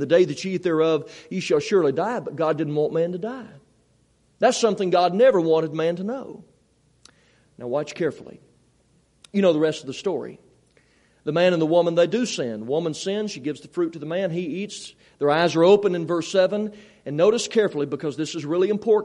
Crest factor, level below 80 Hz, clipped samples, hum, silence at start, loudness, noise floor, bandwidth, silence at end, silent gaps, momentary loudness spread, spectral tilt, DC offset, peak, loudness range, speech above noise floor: 18 dB; -68 dBFS; under 0.1%; none; 0 s; -22 LUFS; -62 dBFS; 11 kHz; 0 s; none; 13 LU; -5.5 dB/octave; under 0.1%; -4 dBFS; 6 LU; 40 dB